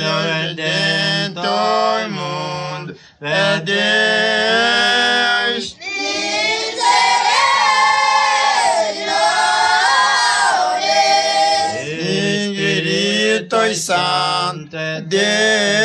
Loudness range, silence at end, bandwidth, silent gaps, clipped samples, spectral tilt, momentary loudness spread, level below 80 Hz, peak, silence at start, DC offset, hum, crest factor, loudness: 4 LU; 0 s; 13 kHz; none; under 0.1%; -2.5 dB/octave; 9 LU; -60 dBFS; -2 dBFS; 0 s; under 0.1%; none; 14 dB; -15 LUFS